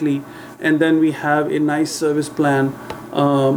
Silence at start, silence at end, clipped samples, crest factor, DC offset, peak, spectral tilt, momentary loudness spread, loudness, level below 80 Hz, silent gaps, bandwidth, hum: 0 s; 0 s; under 0.1%; 16 dB; under 0.1%; -2 dBFS; -6 dB/octave; 9 LU; -18 LUFS; -62 dBFS; none; 19.5 kHz; none